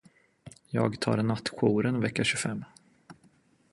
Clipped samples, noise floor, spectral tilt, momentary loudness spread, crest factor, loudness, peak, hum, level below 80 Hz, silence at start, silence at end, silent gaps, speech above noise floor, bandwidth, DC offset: under 0.1%; -64 dBFS; -5 dB/octave; 8 LU; 22 dB; -29 LUFS; -10 dBFS; none; -62 dBFS; 0.45 s; 0.6 s; none; 36 dB; 11.5 kHz; under 0.1%